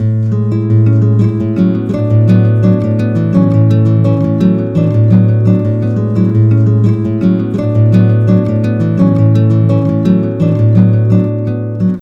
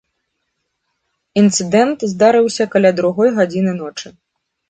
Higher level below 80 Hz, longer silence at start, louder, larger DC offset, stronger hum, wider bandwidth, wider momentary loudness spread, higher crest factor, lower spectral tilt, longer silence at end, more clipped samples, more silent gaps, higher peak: first, -40 dBFS vs -60 dBFS; second, 0 s vs 1.35 s; first, -11 LUFS vs -14 LUFS; neither; neither; second, 4.1 kHz vs 9.6 kHz; second, 5 LU vs 13 LU; second, 10 dB vs 16 dB; first, -11 dB/octave vs -5 dB/octave; second, 0 s vs 0.6 s; first, 0.4% vs under 0.1%; neither; about the same, 0 dBFS vs 0 dBFS